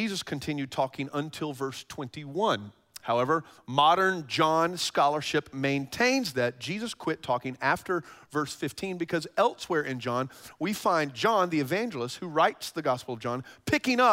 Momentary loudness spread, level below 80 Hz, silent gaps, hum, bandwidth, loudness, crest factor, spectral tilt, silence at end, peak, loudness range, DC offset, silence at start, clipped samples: 10 LU; -66 dBFS; none; none; 16 kHz; -28 LUFS; 20 dB; -4.5 dB/octave; 0 s; -8 dBFS; 5 LU; under 0.1%; 0 s; under 0.1%